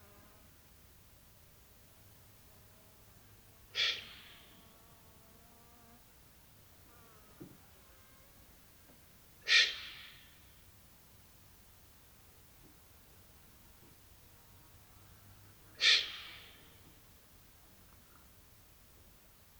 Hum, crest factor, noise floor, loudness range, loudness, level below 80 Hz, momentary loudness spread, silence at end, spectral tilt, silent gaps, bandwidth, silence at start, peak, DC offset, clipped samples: none; 30 dB; -62 dBFS; 24 LU; -31 LUFS; -68 dBFS; 27 LU; 3.15 s; 0.5 dB/octave; none; over 20 kHz; 3.75 s; -12 dBFS; under 0.1%; under 0.1%